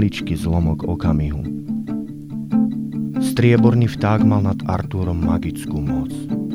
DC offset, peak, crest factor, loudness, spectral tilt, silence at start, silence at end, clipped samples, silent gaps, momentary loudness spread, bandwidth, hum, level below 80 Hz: 0.1%; -2 dBFS; 16 dB; -20 LUFS; -8 dB/octave; 0 s; 0 s; under 0.1%; none; 10 LU; 14.5 kHz; none; -34 dBFS